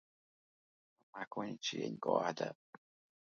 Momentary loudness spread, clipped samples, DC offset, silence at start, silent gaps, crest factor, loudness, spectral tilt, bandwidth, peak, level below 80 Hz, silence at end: 15 LU; under 0.1%; under 0.1%; 1.15 s; 1.27-1.31 s; 26 dB; -40 LUFS; -3 dB/octave; 7.4 kHz; -16 dBFS; -86 dBFS; 0.7 s